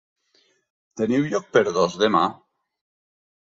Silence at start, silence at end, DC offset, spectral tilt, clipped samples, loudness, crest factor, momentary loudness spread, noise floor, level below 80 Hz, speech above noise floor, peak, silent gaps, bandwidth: 0.95 s; 1.05 s; under 0.1%; -5 dB/octave; under 0.1%; -21 LUFS; 20 dB; 7 LU; -64 dBFS; -64 dBFS; 44 dB; -4 dBFS; none; 7.8 kHz